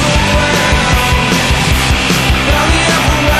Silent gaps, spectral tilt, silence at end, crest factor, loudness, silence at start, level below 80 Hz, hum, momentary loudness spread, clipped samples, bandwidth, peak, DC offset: none; -4 dB/octave; 0 s; 10 dB; -10 LUFS; 0 s; -18 dBFS; none; 1 LU; under 0.1%; 14.5 kHz; 0 dBFS; under 0.1%